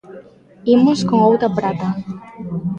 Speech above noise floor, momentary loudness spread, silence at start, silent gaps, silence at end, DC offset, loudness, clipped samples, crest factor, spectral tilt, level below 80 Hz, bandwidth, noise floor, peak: 26 dB; 15 LU; 0.1 s; none; 0 s; under 0.1%; -16 LUFS; under 0.1%; 14 dB; -7.5 dB/octave; -54 dBFS; 9.2 kHz; -42 dBFS; -2 dBFS